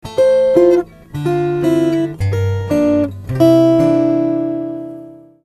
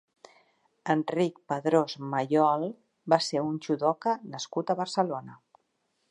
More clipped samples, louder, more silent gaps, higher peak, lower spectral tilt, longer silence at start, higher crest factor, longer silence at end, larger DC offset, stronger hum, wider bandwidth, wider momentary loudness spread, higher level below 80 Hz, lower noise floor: neither; first, -14 LUFS vs -28 LUFS; neither; first, 0 dBFS vs -8 dBFS; first, -8 dB/octave vs -5.5 dB/octave; second, 0.05 s vs 0.85 s; second, 14 dB vs 22 dB; second, 0.3 s vs 0.75 s; neither; neither; first, 13.5 kHz vs 11 kHz; first, 12 LU vs 9 LU; first, -44 dBFS vs -80 dBFS; second, -36 dBFS vs -76 dBFS